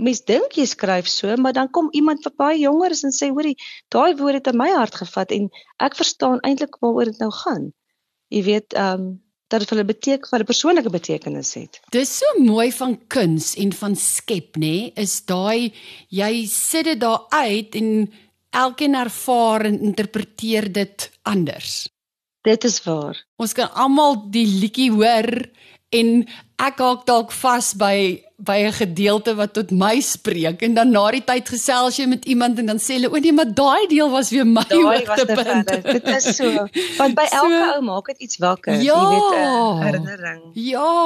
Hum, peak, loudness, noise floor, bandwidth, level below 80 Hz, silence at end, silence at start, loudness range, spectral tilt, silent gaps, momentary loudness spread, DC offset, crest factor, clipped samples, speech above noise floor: none; -4 dBFS; -18 LUFS; -88 dBFS; 13 kHz; -64 dBFS; 0 s; 0 s; 5 LU; -4 dB/octave; 23.28-23.37 s; 9 LU; under 0.1%; 14 dB; under 0.1%; 70 dB